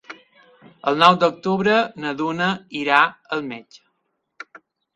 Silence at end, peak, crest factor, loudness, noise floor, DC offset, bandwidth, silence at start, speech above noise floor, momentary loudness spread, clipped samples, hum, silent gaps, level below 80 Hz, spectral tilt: 1.35 s; 0 dBFS; 22 dB; -19 LUFS; -73 dBFS; under 0.1%; 11 kHz; 0.1 s; 54 dB; 21 LU; under 0.1%; none; none; -64 dBFS; -5.5 dB/octave